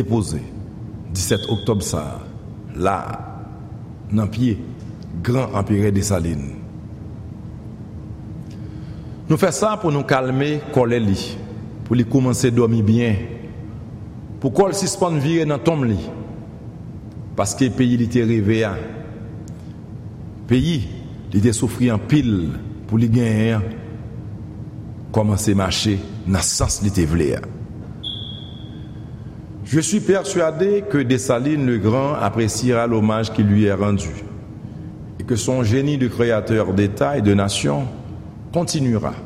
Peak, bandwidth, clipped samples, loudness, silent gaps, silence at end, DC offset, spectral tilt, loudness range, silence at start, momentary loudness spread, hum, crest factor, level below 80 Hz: -4 dBFS; 15.5 kHz; under 0.1%; -19 LUFS; none; 0 s; under 0.1%; -6 dB/octave; 5 LU; 0 s; 17 LU; none; 16 dB; -40 dBFS